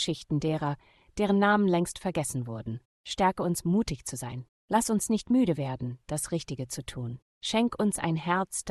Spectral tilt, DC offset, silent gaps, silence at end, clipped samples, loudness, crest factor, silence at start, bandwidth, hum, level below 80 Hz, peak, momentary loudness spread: -5 dB/octave; under 0.1%; 2.85-3.04 s, 4.49-4.68 s, 7.22-7.41 s; 0 s; under 0.1%; -29 LUFS; 18 dB; 0 s; 12.5 kHz; none; -54 dBFS; -10 dBFS; 13 LU